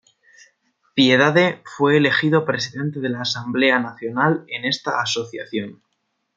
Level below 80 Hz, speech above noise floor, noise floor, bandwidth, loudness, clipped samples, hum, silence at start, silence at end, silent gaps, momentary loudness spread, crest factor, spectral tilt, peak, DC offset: -68 dBFS; 53 dB; -73 dBFS; 7.8 kHz; -19 LUFS; under 0.1%; none; 0.95 s; 0.65 s; none; 12 LU; 18 dB; -5 dB/octave; -2 dBFS; under 0.1%